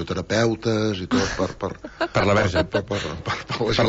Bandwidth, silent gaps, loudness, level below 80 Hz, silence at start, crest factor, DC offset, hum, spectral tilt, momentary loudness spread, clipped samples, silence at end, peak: 8 kHz; none; -23 LUFS; -42 dBFS; 0 s; 14 dB; under 0.1%; none; -5.5 dB/octave; 9 LU; under 0.1%; 0 s; -8 dBFS